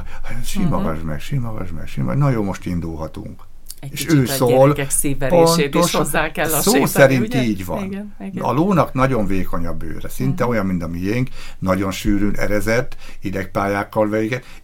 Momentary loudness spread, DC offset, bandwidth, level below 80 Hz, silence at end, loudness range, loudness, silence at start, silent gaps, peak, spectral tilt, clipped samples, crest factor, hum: 16 LU; under 0.1%; 17 kHz; -28 dBFS; 0.05 s; 7 LU; -19 LUFS; 0 s; none; 0 dBFS; -5.5 dB/octave; under 0.1%; 18 dB; none